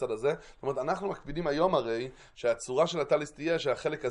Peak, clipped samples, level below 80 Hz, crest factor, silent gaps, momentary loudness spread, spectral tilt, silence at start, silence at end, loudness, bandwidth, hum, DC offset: -14 dBFS; under 0.1%; -58 dBFS; 18 dB; none; 8 LU; -5 dB/octave; 0 s; 0 s; -31 LUFS; 11 kHz; none; under 0.1%